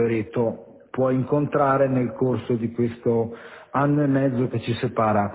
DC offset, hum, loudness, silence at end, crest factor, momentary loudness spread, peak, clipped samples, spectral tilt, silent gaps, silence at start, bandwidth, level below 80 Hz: under 0.1%; none; -23 LUFS; 0 s; 14 dB; 7 LU; -8 dBFS; under 0.1%; -12 dB/octave; none; 0 s; 4 kHz; -54 dBFS